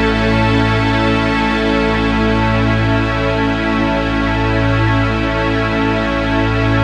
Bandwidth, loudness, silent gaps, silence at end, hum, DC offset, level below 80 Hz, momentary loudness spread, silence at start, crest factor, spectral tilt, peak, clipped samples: 9.2 kHz; -15 LUFS; none; 0 s; none; under 0.1%; -24 dBFS; 2 LU; 0 s; 12 dB; -7 dB/octave; -2 dBFS; under 0.1%